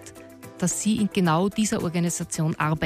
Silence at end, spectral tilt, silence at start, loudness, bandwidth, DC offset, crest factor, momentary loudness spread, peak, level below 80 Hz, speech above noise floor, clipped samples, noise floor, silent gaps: 0 s; -5 dB/octave; 0 s; -24 LUFS; 15.5 kHz; under 0.1%; 14 dB; 16 LU; -10 dBFS; -54 dBFS; 20 dB; under 0.1%; -44 dBFS; none